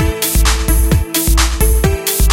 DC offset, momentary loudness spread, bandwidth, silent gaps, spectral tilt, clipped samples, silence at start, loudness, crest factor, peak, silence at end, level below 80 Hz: under 0.1%; 1 LU; 17 kHz; none; -4 dB/octave; under 0.1%; 0 s; -13 LUFS; 12 dB; 0 dBFS; 0 s; -14 dBFS